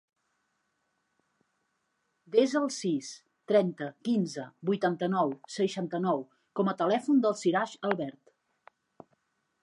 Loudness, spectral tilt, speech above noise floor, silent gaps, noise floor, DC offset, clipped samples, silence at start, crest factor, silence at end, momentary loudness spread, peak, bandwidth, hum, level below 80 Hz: -30 LUFS; -5.5 dB/octave; 49 dB; none; -78 dBFS; under 0.1%; under 0.1%; 2.3 s; 20 dB; 1.5 s; 10 LU; -12 dBFS; 11.5 kHz; none; -84 dBFS